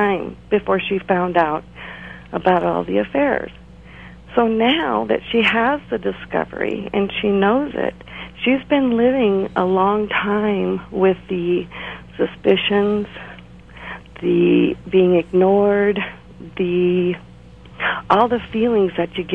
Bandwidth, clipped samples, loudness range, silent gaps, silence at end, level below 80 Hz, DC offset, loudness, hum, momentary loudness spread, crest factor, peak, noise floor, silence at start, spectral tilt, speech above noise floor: 5 kHz; under 0.1%; 3 LU; none; 0 s; -46 dBFS; 0.2%; -18 LUFS; none; 15 LU; 18 dB; -2 dBFS; -41 dBFS; 0 s; -8 dB/octave; 24 dB